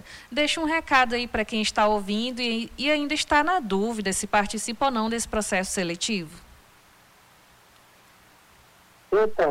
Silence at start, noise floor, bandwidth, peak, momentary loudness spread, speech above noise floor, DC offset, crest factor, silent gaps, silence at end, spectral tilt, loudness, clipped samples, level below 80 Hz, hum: 0.05 s; -55 dBFS; 16.5 kHz; -10 dBFS; 6 LU; 31 dB; under 0.1%; 16 dB; none; 0 s; -3 dB/octave; -24 LUFS; under 0.1%; -50 dBFS; none